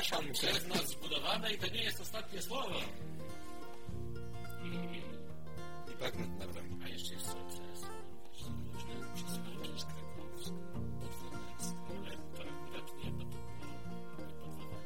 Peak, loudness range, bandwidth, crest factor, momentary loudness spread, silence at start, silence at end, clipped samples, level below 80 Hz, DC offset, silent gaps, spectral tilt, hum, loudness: -18 dBFS; 8 LU; 16.5 kHz; 24 dB; 14 LU; 0 s; 0 s; under 0.1%; -58 dBFS; 1%; none; -3.5 dB/octave; none; -42 LUFS